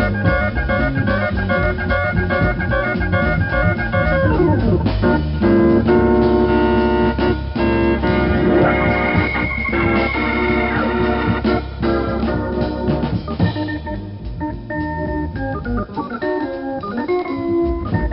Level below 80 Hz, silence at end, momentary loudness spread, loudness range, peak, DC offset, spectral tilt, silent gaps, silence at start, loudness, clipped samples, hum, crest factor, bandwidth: -26 dBFS; 0 s; 9 LU; 7 LU; -2 dBFS; under 0.1%; -6 dB/octave; none; 0 s; -18 LUFS; under 0.1%; none; 14 dB; 5.8 kHz